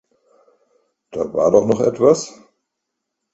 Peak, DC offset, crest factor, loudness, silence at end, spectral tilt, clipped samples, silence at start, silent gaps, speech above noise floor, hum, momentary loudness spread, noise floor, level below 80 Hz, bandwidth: 0 dBFS; under 0.1%; 20 dB; -16 LUFS; 1.05 s; -6 dB/octave; under 0.1%; 1.15 s; none; 62 dB; none; 15 LU; -78 dBFS; -56 dBFS; 8.2 kHz